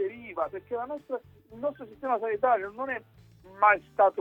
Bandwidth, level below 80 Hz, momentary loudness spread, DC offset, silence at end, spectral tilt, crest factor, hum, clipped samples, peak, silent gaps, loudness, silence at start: 5.4 kHz; -66 dBFS; 14 LU; under 0.1%; 0 s; -7 dB/octave; 20 dB; none; under 0.1%; -8 dBFS; none; -29 LUFS; 0 s